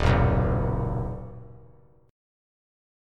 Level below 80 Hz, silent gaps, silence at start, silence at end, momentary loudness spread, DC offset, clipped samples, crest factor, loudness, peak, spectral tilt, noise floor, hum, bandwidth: -34 dBFS; none; 0 s; 1.5 s; 20 LU; under 0.1%; under 0.1%; 20 dB; -26 LUFS; -8 dBFS; -8 dB/octave; -55 dBFS; none; 7.6 kHz